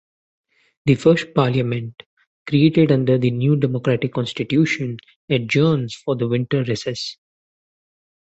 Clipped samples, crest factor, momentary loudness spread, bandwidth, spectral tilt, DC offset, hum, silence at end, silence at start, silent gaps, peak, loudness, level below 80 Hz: under 0.1%; 18 dB; 11 LU; 8.2 kHz; -7 dB/octave; under 0.1%; none; 1.15 s; 0.85 s; 2.06-2.17 s, 2.27-2.45 s, 5.16-5.28 s; -2 dBFS; -19 LUFS; -56 dBFS